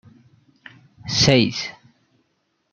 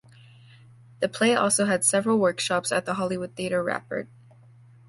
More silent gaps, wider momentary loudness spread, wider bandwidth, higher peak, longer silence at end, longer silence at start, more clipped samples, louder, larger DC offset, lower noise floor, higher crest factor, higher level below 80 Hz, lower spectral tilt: neither; first, 18 LU vs 10 LU; second, 8.2 kHz vs 12 kHz; first, -2 dBFS vs -8 dBFS; first, 1 s vs 0.85 s; about the same, 1.05 s vs 1 s; neither; first, -18 LUFS vs -24 LUFS; neither; first, -70 dBFS vs -52 dBFS; about the same, 22 dB vs 18 dB; first, -52 dBFS vs -64 dBFS; about the same, -4 dB/octave vs -3.5 dB/octave